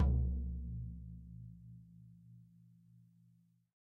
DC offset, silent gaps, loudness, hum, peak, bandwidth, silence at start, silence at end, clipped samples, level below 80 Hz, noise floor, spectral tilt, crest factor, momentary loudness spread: under 0.1%; none; -42 LUFS; none; -22 dBFS; 1.5 kHz; 0 s; 1.4 s; under 0.1%; -42 dBFS; -71 dBFS; -11 dB/octave; 20 dB; 27 LU